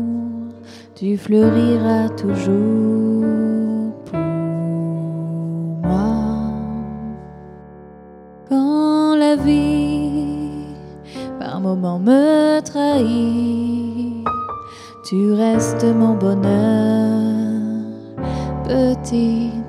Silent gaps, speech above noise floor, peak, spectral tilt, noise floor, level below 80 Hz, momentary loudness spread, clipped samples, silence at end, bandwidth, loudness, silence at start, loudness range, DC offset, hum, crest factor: none; 25 dB; -2 dBFS; -7.5 dB/octave; -40 dBFS; -42 dBFS; 14 LU; under 0.1%; 0 s; 11.5 kHz; -18 LUFS; 0 s; 5 LU; under 0.1%; none; 16 dB